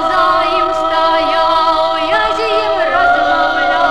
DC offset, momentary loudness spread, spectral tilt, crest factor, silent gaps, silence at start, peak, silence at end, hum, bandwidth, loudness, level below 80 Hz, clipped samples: 2%; 2 LU; -3.5 dB/octave; 10 dB; none; 0 s; -2 dBFS; 0 s; none; 11.5 kHz; -12 LUFS; -42 dBFS; under 0.1%